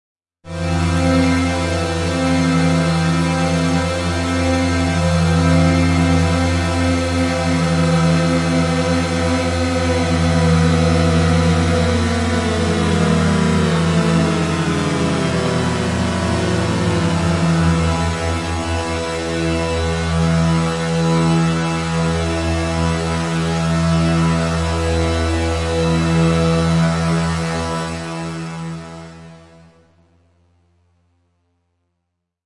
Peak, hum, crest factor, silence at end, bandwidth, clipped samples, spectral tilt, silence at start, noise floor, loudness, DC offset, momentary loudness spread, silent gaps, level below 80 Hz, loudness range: -2 dBFS; none; 14 dB; 3.05 s; 11.5 kHz; under 0.1%; -6 dB/octave; 0.45 s; -75 dBFS; -17 LUFS; under 0.1%; 6 LU; none; -36 dBFS; 3 LU